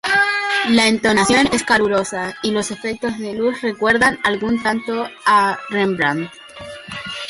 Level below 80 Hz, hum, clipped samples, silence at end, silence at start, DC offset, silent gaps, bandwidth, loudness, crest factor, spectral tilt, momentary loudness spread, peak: -50 dBFS; none; under 0.1%; 0 s; 0.05 s; under 0.1%; none; 11.5 kHz; -17 LUFS; 16 dB; -3.5 dB/octave; 12 LU; -2 dBFS